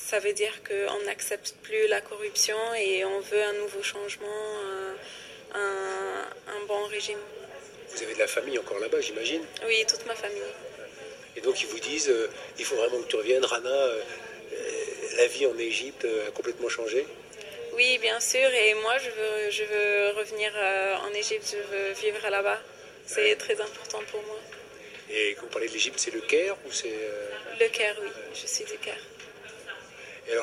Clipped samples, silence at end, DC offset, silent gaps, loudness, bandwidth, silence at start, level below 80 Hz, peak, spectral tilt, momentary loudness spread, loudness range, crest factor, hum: under 0.1%; 0 s; under 0.1%; none; -28 LUFS; 15 kHz; 0 s; -72 dBFS; -8 dBFS; -0.5 dB/octave; 17 LU; 7 LU; 20 dB; none